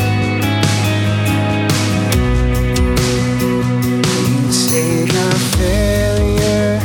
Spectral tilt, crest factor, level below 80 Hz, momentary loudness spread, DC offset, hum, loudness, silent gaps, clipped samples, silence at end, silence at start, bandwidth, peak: -5 dB/octave; 14 dB; -24 dBFS; 2 LU; under 0.1%; none; -15 LUFS; none; under 0.1%; 0 s; 0 s; over 20 kHz; 0 dBFS